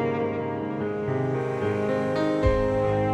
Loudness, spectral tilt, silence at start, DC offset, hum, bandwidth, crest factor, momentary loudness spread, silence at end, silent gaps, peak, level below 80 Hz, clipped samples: -26 LUFS; -8 dB/octave; 0 s; under 0.1%; none; 10 kHz; 16 dB; 6 LU; 0 s; none; -8 dBFS; -38 dBFS; under 0.1%